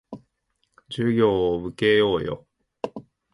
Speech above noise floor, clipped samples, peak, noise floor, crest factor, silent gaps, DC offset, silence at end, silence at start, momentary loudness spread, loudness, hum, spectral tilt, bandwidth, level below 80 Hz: 52 dB; under 0.1%; -6 dBFS; -73 dBFS; 18 dB; none; under 0.1%; 0.35 s; 0.1 s; 21 LU; -22 LUFS; none; -7 dB/octave; 11 kHz; -52 dBFS